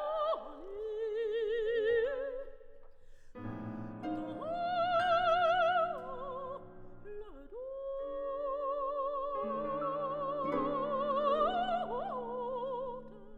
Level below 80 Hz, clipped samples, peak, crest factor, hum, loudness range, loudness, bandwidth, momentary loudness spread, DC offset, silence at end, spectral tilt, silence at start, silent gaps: -56 dBFS; under 0.1%; -18 dBFS; 16 dB; none; 6 LU; -35 LUFS; 8.8 kHz; 17 LU; under 0.1%; 0 s; -6.5 dB/octave; 0 s; none